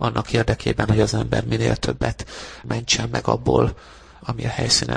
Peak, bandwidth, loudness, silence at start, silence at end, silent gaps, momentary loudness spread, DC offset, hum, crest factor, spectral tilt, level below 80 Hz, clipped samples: -2 dBFS; 10.5 kHz; -21 LUFS; 0 s; 0 s; none; 13 LU; under 0.1%; none; 20 dB; -4.5 dB/octave; -36 dBFS; under 0.1%